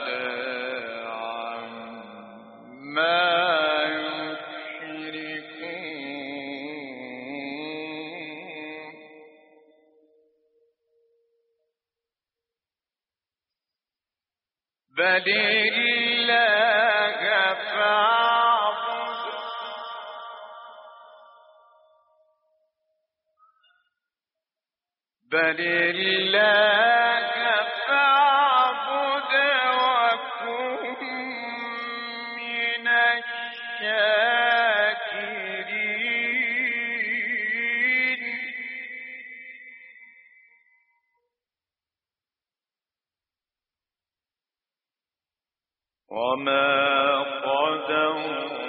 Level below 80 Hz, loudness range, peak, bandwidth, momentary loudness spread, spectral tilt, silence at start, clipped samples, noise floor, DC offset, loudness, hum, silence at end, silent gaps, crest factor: -82 dBFS; 16 LU; -8 dBFS; 5.4 kHz; 18 LU; 1 dB/octave; 0 s; under 0.1%; under -90 dBFS; under 0.1%; -23 LUFS; none; 0 s; none; 18 dB